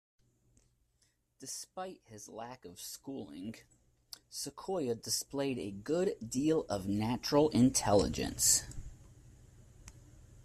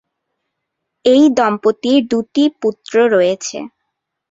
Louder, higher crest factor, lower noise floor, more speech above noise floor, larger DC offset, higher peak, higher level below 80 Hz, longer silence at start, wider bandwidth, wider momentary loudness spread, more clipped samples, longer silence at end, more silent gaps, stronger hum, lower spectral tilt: second, -33 LUFS vs -14 LUFS; first, 22 dB vs 14 dB; about the same, -75 dBFS vs -76 dBFS; second, 41 dB vs 62 dB; neither; second, -14 dBFS vs -2 dBFS; about the same, -56 dBFS vs -60 dBFS; first, 1.4 s vs 1.05 s; first, 15.5 kHz vs 7.8 kHz; first, 21 LU vs 12 LU; neither; second, 0 s vs 0.65 s; neither; neither; about the same, -4 dB/octave vs -4.5 dB/octave